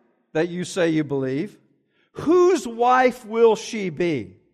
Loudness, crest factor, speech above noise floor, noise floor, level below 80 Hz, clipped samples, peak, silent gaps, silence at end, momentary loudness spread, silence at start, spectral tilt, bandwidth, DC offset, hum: -21 LUFS; 16 dB; 44 dB; -64 dBFS; -62 dBFS; under 0.1%; -4 dBFS; none; 0.3 s; 12 LU; 0.35 s; -5.5 dB/octave; 13 kHz; under 0.1%; none